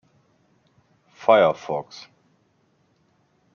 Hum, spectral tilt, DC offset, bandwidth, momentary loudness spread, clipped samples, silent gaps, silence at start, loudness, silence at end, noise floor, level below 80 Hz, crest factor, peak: none; -3 dB/octave; under 0.1%; 7 kHz; 24 LU; under 0.1%; none; 1.2 s; -20 LUFS; 1.7 s; -65 dBFS; -74 dBFS; 24 dB; -2 dBFS